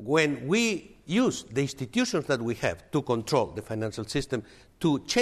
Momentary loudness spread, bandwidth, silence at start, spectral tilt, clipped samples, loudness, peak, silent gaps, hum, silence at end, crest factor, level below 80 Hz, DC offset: 8 LU; 14.5 kHz; 0 s; -5 dB/octave; under 0.1%; -28 LUFS; -10 dBFS; none; none; 0 s; 18 dB; -54 dBFS; under 0.1%